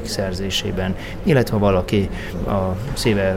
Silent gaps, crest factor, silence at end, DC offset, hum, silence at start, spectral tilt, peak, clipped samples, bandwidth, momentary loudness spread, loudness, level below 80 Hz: none; 18 dB; 0 s; under 0.1%; none; 0 s; -5.5 dB/octave; -2 dBFS; under 0.1%; 16 kHz; 7 LU; -21 LUFS; -32 dBFS